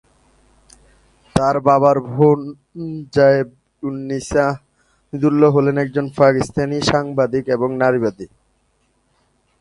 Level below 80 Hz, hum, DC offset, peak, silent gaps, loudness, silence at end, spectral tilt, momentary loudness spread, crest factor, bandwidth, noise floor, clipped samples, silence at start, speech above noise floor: -48 dBFS; none; under 0.1%; 0 dBFS; none; -17 LUFS; 1.35 s; -6.5 dB/octave; 16 LU; 18 dB; 11.5 kHz; -63 dBFS; under 0.1%; 1.35 s; 47 dB